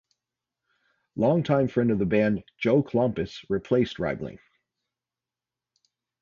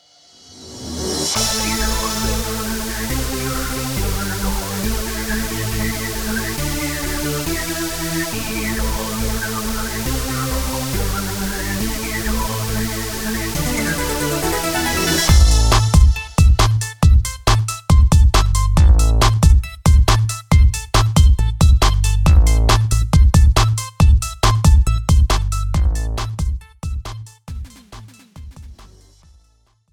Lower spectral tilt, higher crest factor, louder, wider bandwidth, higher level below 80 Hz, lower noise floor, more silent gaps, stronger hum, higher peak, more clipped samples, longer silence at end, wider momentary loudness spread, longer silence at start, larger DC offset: first, -8.5 dB/octave vs -4.5 dB/octave; about the same, 18 dB vs 16 dB; second, -25 LUFS vs -17 LUFS; second, 7.2 kHz vs over 20 kHz; second, -56 dBFS vs -18 dBFS; first, under -90 dBFS vs -57 dBFS; neither; neither; second, -8 dBFS vs 0 dBFS; neither; first, 1.85 s vs 1.05 s; about the same, 9 LU vs 9 LU; first, 1.15 s vs 0.55 s; neither